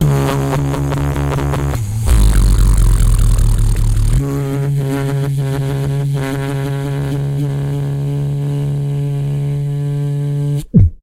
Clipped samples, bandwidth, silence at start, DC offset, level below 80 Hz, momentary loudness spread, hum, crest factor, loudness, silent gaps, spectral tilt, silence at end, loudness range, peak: under 0.1%; 16.5 kHz; 0 s; under 0.1%; -18 dBFS; 5 LU; none; 14 dB; -16 LUFS; none; -7 dB/octave; 0.05 s; 4 LU; 0 dBFS